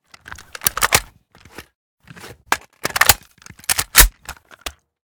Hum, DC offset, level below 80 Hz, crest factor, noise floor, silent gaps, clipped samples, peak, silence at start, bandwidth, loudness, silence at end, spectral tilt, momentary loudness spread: none; under 0.1%; -30 dBFS; 22 dB; -48 dBFS; 1.75-1.97 s; 0.2%; 0 dBFS; 0.3 s; over 20 kHz; -16 LUFS; 0.4 s; -0.5 dB/octave; 25 LU